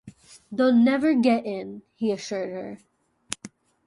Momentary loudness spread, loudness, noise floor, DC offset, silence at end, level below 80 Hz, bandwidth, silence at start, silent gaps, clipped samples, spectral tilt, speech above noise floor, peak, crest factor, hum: 17 LU; -23 LUFS; -47 dBFS; under 0.1%; 0.4 s; -68 dBFS; 11.5 kHz; 0.05 s; none; under 0.1%; -5 dB/octave; 24 dB; -6 dBFS; 20 dB; none